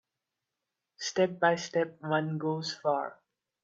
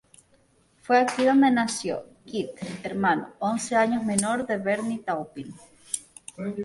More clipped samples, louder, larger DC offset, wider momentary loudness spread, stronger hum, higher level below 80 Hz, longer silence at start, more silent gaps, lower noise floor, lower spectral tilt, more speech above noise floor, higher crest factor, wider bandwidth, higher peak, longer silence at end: neither; second, -31 LUFS vs -25 LUFS; neither; second, 7 LU vs 15 LU; neither; second, -80 dBFS vs -64 dBFS; about the same, 1 s vs 0.9 s; neither; first, -87 dBFS vs -62 dBFS; about the same, -4.5 dB/octave vs -4.5 dB/octave; first, 57 dB vs 38 dB; about the same, 20 dB vs 20 dB; second, 8 kHz vs 11.5 kHz; second, -12 dBFS vs -6 dBFS; first, 0.5 s vs 0 s